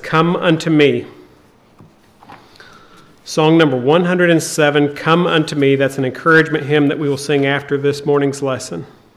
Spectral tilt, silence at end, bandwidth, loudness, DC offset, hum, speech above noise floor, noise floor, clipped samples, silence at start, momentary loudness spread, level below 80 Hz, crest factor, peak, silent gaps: -5.5 dB/octave; 0.3 s; 14 kHz; -14 LUFS; under 0.1%; none; 34 dB; -48 dBFS; under 0.1%; 0 s; 8 LU; -58 dBFS; 14 dB; 0 dBFS; none